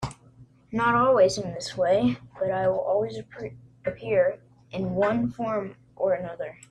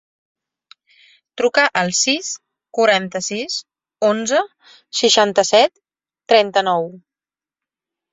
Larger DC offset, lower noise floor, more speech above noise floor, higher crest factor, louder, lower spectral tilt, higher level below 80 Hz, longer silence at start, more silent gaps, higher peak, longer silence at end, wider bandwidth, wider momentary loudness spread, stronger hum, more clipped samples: neither; second, -53 dBFS vs under -90 dBFS; second, 28 dB vs over 73 dB; about the same, 16 dB vs 18 dB; second, -25 LUFS vs -17 LUFS; first, -6 dB/octave vs -2 dB/octave; first, -56 dBFS vs -66 dBFS; second, 0 s vs 1.35 s; neither; second, -10 dBFS vs 0 dBFS; second, 0.2 s vs 1.15 s; first, 10.5 kHz vs 8 kHz; first, 17 LU vs 12 LU; neither; neither